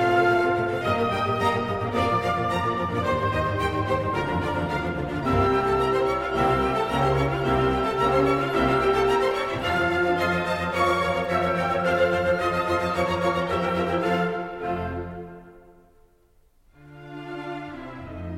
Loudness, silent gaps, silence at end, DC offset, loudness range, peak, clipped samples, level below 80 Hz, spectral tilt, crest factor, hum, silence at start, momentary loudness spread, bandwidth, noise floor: -24 LUFS; none; 0 s; under 0.1%; 8 LU; -8 dBFS; under 0.1%; -42 dBFS; -6.5 dB/octave; 16 dB; none; 0 s; 10 LU; 16 kHz; -59 dBFS